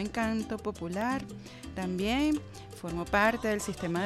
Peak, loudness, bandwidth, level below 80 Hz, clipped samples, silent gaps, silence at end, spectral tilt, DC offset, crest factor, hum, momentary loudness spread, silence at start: -14 dBFS; -31 LUFS; 15.5 kHz; -50 dBFS; under 0.1%; none; 0 s; -5 dB/octave; under 0.1%; 18 dB; none; 16 LU; 0 s